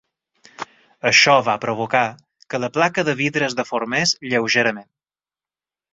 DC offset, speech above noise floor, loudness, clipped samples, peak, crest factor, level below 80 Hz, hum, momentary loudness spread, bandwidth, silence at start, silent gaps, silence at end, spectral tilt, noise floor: under 0.1%; over 71 dB; -18 LUFS; under 0.1%; -2 dBFS; 20 dB; -62 dBFS; none; 20 LU; 8.2 kHz; 0.6 s; none; 1.1 s; -3 dB/octave; under -90 dBFS